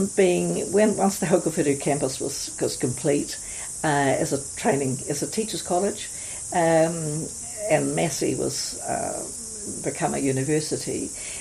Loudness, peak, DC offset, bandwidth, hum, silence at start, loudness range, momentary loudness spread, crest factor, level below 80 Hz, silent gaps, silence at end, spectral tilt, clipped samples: -24 LUFS; -6 dBFS; under 0.1%; 15 kHz; none; 0 s; 2 LU; 9 LU; 18 dB; -54 dBFS; none; 0 s; -4 dB/octave; under 0.1%